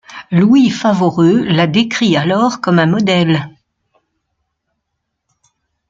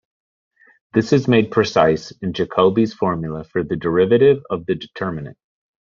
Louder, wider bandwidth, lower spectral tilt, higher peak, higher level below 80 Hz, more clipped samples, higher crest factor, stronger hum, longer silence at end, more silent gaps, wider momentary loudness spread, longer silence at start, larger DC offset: first, -12 LUFS vs -18 LUFS; about the same, 7.6 kHz vs 7.4 kHz; about the same, -6.5 dB/octave vs -5.5 dB/octave; about the same, 0 dBFS vs 0 dBFS; about the same, -54 dBFS vs -52 dBFS; neither; about the same, 14 dB vs 18 dB; neither; first, 2.4 s vs 0.5 s; neither; second, 5 LU vs 12 LU; second, 0.1 s vs 0.95 s; neither